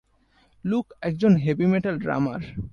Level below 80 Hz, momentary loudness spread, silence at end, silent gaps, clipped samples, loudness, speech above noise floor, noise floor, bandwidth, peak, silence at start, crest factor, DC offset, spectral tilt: -52 dBFS; 10 LU; 0.05 s; none; under 0.1%; -24 LUFS; 39 dB; -62 dBFS; 6.8 kHz; -6 dBFS; 0.65 s; 18 dB; under 0.1%; -9 dB/octave